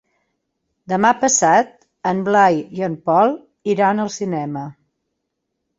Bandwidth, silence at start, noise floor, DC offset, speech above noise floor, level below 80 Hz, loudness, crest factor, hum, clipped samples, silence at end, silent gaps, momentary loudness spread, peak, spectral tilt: 8 kHz; 0.9 s; -76 dBFS; under 0.1%; 59 dB; -62 dBFS; -17 LUFS; 18 dB; none; under 0.1%; 1.05 s; none; 13 LU; -2 dBFS; -4 dB/octave